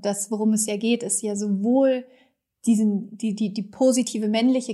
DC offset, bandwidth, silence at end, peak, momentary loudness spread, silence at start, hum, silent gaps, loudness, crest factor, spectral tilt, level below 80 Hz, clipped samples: under 0.1%; 13.5 kHz; 0 s; -10 dBFS; 7 LU; 0 s; none; none; -23 LUFS; 14 dB; -4.5 dB/octave; -78 dBFS; under 0.1%